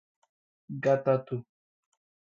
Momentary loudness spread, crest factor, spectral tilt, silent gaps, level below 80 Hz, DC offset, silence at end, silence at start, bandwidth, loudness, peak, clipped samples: 13 LU; 20 dB; -8.5 dB/octave; none; -76 dBFS; under 0.1%; 0.8 s; 0.7 s; 7.2 kHz; -29 LUFS; -12 dBFS; under 0.1%